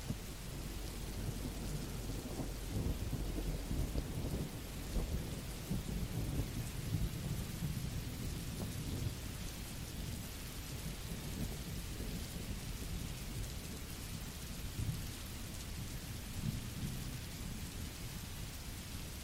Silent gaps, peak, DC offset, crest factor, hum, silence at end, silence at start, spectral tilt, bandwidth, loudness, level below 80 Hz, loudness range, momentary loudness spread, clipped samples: none; -24 dBFS; under 0.1%; 18 dB; none; 0 s; 0 s; -5 dB/octave; 19 kHz; -43 LUFS; -46 dBFS; 3 LU; 5 LU; under 0.1%